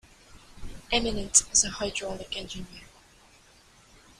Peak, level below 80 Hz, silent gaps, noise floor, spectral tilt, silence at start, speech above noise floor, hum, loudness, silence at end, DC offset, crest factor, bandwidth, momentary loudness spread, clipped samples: -2 dBFS; -46 dBFS; none; -57 dBFS; -1 dB/octave; 0.3 s; 29 dB; none; -25 LUFS; 1.35 s; under 0.1%; 30 dB; 15.5 kHz; 24 LU; under 0.1%